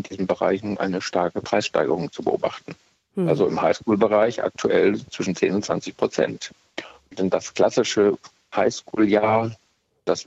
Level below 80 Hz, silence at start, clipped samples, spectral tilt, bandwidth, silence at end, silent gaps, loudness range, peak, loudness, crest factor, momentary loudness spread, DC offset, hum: -60 dBFS; 0 s; under 0.1%; -5 dB/octave; 8.2 kHz; 0 s; none; 2 LU; -6 dBFS; -22 LUFS; 16 dB; 13 LU; under 0.1%; none